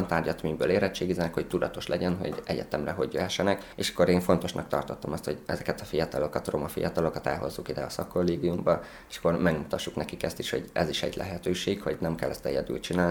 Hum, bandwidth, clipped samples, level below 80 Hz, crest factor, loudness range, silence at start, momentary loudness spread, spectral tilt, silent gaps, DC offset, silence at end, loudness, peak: none; 19.5 kHz; under 0.1%; -50 dBFS; 20 dB; 3 LU; 0 s; 7 LU; -5.5 dB/octave; none; under 0.1%; 0 s; -29 LUFS; -8 dBFS